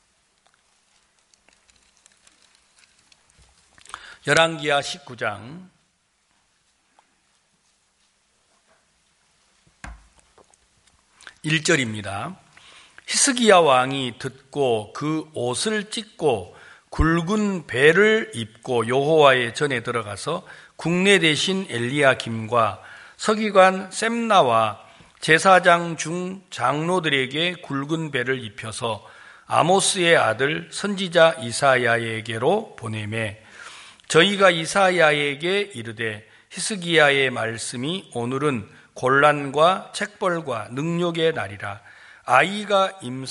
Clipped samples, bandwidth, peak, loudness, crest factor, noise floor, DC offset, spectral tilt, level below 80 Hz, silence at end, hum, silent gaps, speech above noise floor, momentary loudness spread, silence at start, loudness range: under 0.1%; 11.5 kHz; -2 dBFS; -20 LUFS; 22 dB; -67 dBFS; under 0.1%; -3.5 dB/octave; -46 dBFS; 0 s; none; none; 46 dB; 16 LU; 3.95 s; 6 LU